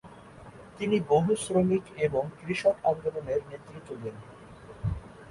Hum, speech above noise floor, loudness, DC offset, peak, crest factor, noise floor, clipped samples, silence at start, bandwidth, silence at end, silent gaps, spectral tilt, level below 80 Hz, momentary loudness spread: none; 21 dB; -29 LUFS; under 0.1%; -12 dBFS; 18 dB; -48 dBFS; under 0.1%; 0.05 s; 11.5 kHz; 0 s; none; -6.5 dB/octave; -50 dBFS; 24 LU